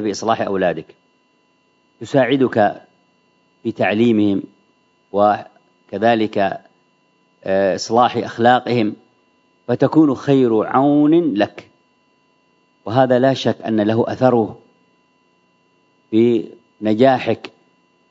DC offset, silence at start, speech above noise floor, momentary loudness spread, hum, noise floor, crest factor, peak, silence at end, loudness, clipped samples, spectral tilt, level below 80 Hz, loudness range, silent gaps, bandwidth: under 0.1%; 0 s; 45 dB; 12 LU; none; -60 dBFS; 18 dB; 0 dBFS; 0.6 s; -17 LUFS; under 0.1%; -6.5 dB/octave; -64 dBFS; 4 LU; none; 7.8 kHz